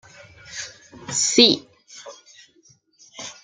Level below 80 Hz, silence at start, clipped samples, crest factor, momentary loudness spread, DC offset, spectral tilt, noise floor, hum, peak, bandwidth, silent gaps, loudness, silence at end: -66 dBFS; 0.5 s; under 0.1%; 24 dB; 26 LU; under 0.1%; -1.5 dB/octave; -58 dBFS; none; -2 dBFS; 12 kHz; none; -17 LUFS; 0.1 s